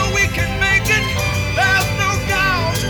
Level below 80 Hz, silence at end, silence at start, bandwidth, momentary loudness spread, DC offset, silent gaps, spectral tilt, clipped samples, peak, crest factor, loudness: -28 dBFS; 0 s; 0 s; over 20 kHz; 4 LU; under 0.1%; none; -3.5 dB/octave; under 0.1%; -2 dBFS; 14 dB; -16 LUFS